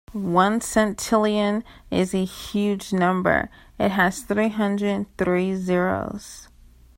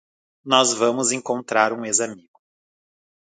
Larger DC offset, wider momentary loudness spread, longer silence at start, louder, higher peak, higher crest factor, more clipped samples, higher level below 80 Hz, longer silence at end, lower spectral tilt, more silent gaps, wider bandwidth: neither; about the same, 8 LU vs 6 LU; second, 0.1 s vs 0.45 s; second, -23 LUFS vs -20 LUFS; second, -4 dBFS vs 0 dBFS; about the same, 20 dB vs 22 dB; neither; first, -48 dBFS vs -72 dBFS; second, 0.55 s vs 1.05 s; first, -5.5 dB/octave vs -1.5 dB/octave; neither; first, 16.5 kHz vs 9.6 kHz